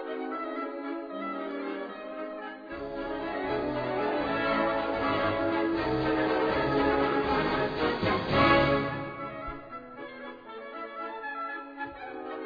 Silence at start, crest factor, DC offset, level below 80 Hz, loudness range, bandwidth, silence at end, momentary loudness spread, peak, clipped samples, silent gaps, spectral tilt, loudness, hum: 0 s; 20 dB; under 0.1%; -50 dBFS; 10 LU; 5.2 kHz; 0 s; 14 LU; -10 dBFS; under 0.1%; none; -7.5 dB/octave; -30 LUFS; none